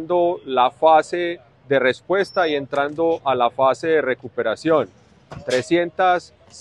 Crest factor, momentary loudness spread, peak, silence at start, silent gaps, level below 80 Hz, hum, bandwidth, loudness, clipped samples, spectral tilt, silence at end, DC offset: 18 dB; 8 LU; -2 dBFS; 0 s; none; -60 dBFS; none; 11 kHz; -20 LUFS; under 0.1%; -5 dB/octave; 0 s; under 0.1%